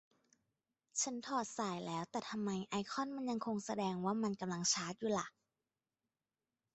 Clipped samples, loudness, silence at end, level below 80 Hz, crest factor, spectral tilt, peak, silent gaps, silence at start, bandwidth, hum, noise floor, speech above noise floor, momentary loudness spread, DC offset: under 0.1%; -40 LUFS; 1.45 s; -80 dBFS; 20 dB; -3.5 dB/octave; -22 dBFS; none; 0.95 s; 8.2 kHz; none; under -90 dBFS; over 50 dB; 6 LU; under 0.1%